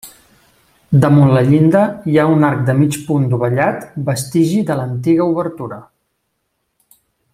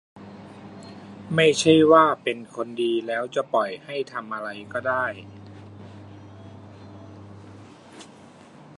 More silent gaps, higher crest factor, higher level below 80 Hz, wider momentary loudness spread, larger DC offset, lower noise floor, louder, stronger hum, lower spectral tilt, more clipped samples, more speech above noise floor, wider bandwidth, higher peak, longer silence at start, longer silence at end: neither; second, 14 dB vs 22 dB; first, -52 dBFS vs -64 dBFS; second, 10 LU vs 28 LU; neither; first, -70 dBFS vs -48 dBFS; first, -14 LUFS vs -22 LUFS; neither; first, -7.5 dB/octave vs -4.5 dB/octave; neither; first, 56 dB vs 26 dB; first, 15 kHz vs 11 kHz; first, 0 dBFS vs -4 dBFS; about the same, 0.05 s vs 0.15 s; first, 1.55 s vs 0.75 s